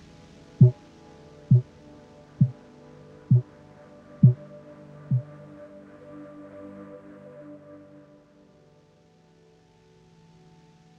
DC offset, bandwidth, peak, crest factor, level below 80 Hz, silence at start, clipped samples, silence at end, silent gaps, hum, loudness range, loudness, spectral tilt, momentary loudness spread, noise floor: under 0.1%; 2.6 kHz; -4 dBFS; 24 dB; -58 dBFS; 0.6 s; under 0.1%; 5.75 s; none; none; 21 LU; -23 LUFS; -11 dB/octave; 27 LU; -58 dBFS